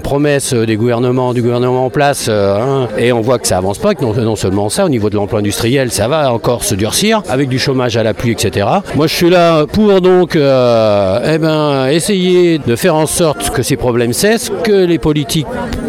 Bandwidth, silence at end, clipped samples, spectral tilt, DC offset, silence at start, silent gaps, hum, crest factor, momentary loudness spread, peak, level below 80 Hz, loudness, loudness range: 16.5 kHz; 0 s; under 0.1%; -5 dB/octave; under 0.1%; 0 s; none; none; 12 dB; 5 LU; 0 dBFS; -36 dBFS; -12 LUFS; 3 LU